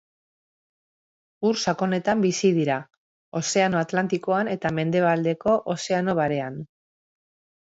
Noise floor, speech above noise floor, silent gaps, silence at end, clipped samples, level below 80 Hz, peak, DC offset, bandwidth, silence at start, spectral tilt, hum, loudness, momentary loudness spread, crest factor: under -90 dBFS; over 67 dB; 2.97-3.32 s; 1 s; under 0.1%; -64 dBFS; -8 dBFS; under 0.1%; 8 kHz; 1.4 s; -5 dB/octave; none; -24 LUFS; 7 LU; 18 dB